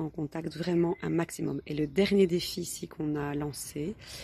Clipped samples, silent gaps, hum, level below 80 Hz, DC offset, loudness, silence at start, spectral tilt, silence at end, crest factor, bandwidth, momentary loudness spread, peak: under 0.1%; none; none; -56 dBFS; under 0.1%; -31 LUFS; 0 s; -5.5 dB/octave; 0 s; 18 dB; 13 kHz; 11 LU; -12 dBFS